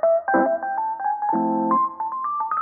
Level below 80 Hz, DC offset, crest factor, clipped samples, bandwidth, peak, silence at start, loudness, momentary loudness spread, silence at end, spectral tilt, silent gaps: -70 dBFS; under 0.1%; 16 dB; under 0.1%; 2.5 kHz; -6 dBFS; 0 s; -22 LUFS; 6 LU; 0 s; 0 dB/octave; none